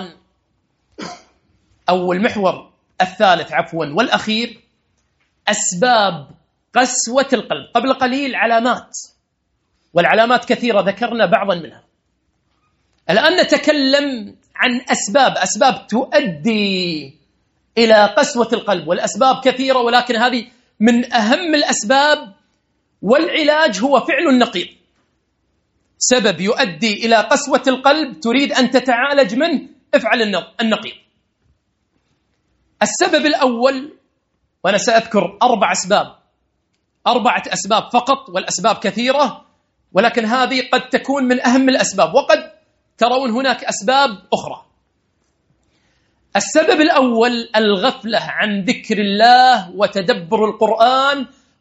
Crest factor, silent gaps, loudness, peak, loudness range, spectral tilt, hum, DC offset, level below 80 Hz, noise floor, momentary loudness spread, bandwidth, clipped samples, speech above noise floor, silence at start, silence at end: 16 dB; none; -15 LUFS; 0 dBFS; 4 LU; -3 dB/octave; none; under 0.1%; -62 dBFS; -68 dBFS; 8 LU; 8.2 kHz; under 0.1%; 53 dB; 0 s; 0.35 s